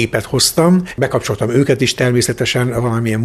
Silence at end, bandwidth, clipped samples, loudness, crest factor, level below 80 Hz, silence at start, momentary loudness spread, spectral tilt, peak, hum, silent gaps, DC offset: 0 s; 14 kHz; under 0.1%; -15 LUFS; 14 dB; -42 dBFS; 0 s; 5 LU; -4.5 dB/octave; 0 dBFS; none; none; under 0.1%